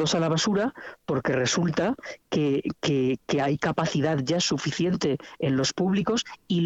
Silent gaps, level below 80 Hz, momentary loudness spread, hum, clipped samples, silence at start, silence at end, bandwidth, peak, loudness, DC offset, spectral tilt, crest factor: none; -58 dBFS; 5 LU; none; under 0.1%; 0 s; 0 s; 8.2 kHz; -10 dBFS; -26 LUFS; under 0.1%; -5 dB/octave; 16 dB